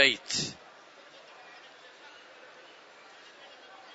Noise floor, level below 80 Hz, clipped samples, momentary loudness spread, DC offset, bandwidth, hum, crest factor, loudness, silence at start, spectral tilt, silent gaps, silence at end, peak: -53 dBFS; -74 dBFS; under 0.1%; 20 LU; under 0.1%; 8.2 kHz; none; 30 dB; -29 LUFS; 0 s; -1 dB/octave; none; 0.2 s; -6 dBFS